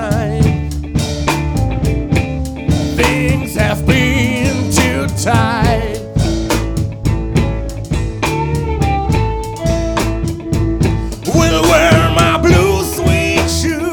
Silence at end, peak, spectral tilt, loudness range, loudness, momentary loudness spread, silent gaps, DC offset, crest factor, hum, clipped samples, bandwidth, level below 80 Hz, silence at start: 0 s; -2 dBFS; -5.5 dB/octave; 5 LU; -14 LUFS; 9 LU; none; under 0.1%; 12 dB; none; under 0.1%; over 20 kHz; -22 dBFS; 0 s